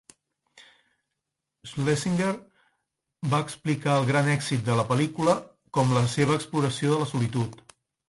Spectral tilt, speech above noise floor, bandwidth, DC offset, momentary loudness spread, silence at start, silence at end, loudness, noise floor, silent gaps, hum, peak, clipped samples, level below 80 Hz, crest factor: -6 dB/octave; 59 dB; 11.5 kHz; under 0.1%; 8 LU; 0.55 s; 0.55 s; -26 LUFS; -84 dBFS; none; none; -8 dBFS; under 0.1%; -60 dBFS; 20 dB